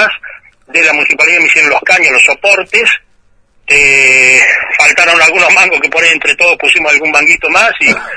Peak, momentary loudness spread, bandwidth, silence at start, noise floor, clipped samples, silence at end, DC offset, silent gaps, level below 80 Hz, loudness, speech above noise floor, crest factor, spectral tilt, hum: 0 dBFS; 5 LU; 11 kHz; 0 s; -48 dBFS; 1%; 0 s; under 0.1%; none; -44 dBFS; -6 LUFS; 40 dB; 8 dB; -0.5 dB/octave; none